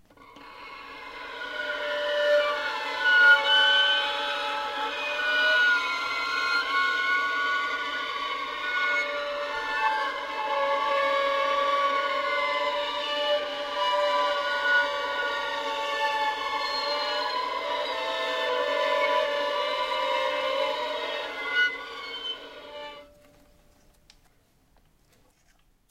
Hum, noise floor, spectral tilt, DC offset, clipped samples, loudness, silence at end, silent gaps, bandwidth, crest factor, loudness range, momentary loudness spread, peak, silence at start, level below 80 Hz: none; -63 dBFS; -0.5 dB/octave; under 0.1%; under 0.1%; -25 LUFS; 2.85 s; none; 16 kHz; 20 dB; 8 LU; 11 LU; -8 dBFS; 0.2 s; -64 dBFS